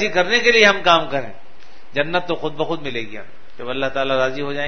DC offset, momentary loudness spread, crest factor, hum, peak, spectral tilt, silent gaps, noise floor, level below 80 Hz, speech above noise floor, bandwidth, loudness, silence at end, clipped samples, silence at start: 5%; 17 LU; 20 dB; none; 0 dBFS; -3.5 dB/octave; none; -48 dBFS; -50 dBFS; 29 dB; 6.6 kHz; -18 LUFS; 0 s; under 0.1%; 0 s